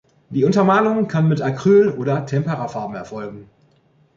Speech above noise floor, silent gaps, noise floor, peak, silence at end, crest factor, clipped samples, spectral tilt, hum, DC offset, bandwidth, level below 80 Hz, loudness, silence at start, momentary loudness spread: 40 dB; none; -57 dBFS; -4 dBFS; 0.75 s; 14 dB; under 0.1%; -8 dB/octave; none; under 0.1%; 7.6 kHz; -58 dBFS; -18 LUFS; 0.3 s; 15 LU